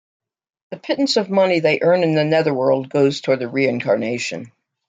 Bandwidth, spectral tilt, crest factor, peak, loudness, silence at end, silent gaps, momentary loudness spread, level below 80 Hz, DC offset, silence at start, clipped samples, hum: 9.2 kHz; -5.5 dB/octave; 16 dB; -4 dBFS; -18 LUFS; 0.4 s; none; 9 LU; -66 dBFS; under 0.1%; 0.7 s; under 0.1%; none